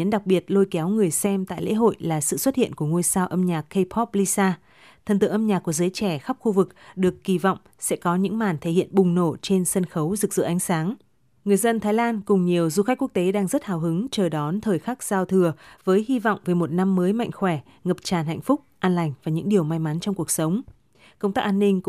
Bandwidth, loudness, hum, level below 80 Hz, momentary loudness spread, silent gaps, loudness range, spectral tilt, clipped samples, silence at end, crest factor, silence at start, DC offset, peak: 15.5 kHz; -23 LUFS; none; -60 dBFS; 5 LU; none; 2 LU; -5.5 dB/octave; under 0.1%; 0 s; 16 dB; 0 s; under 0.1%; -6 dBFS